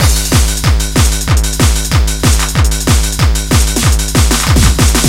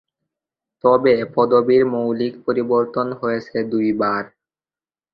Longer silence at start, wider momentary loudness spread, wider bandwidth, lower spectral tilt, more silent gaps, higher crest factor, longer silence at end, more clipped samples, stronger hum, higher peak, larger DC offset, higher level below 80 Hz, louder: second, 0 s vs 0.85 s; second, 3 LU vs 8 LU; first, 16.5 kHz vs 5.8 kHz; second, -4 dB/octave vs -8.5 dB/octave; neither; second, 10 dB vs 18 dB; second, 0 s vs 0.85 s; first, 0.2% vs under 0.1%; neither; about the same, 0 dBFS vs -2 dBFS; neither; first, -12 dBFS vs -60 dBFS; first, -11 LUFS vs -19 LUFS